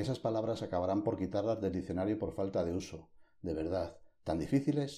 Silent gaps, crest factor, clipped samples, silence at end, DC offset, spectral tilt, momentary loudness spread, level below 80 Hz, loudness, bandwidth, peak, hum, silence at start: none; 16 dB; under 0.1%; 0 s; under 0.1%; -7.5 dB/octave; 10 LU; -58 dBFS; -36 LUFS; 12.5 kHz; -20 dBFS; none; 0 s